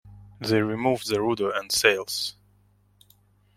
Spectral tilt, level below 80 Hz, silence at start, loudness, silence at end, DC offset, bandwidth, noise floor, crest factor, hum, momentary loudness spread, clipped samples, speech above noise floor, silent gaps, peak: -3.5 dB/octave; -60 dBFS; 0.05 s; -24 LUFS; 1.25 s; under 0.1%; 16.5 kHz; -62 dBFS; 24 dB; 50 Hz at -55 dBFS; 9 LU; under 0.1%; 37 dB; none; -4 dBFS